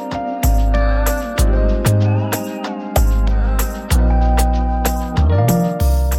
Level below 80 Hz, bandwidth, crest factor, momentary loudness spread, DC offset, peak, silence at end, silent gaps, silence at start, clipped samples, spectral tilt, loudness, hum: -16 dBFS; 17 kHz; 12 dB; 6 LU; under 0.1%; -2 dBFS; 0 s; none; 0 s; under 0.1%; -6 dB/octave; -17 LUFS; none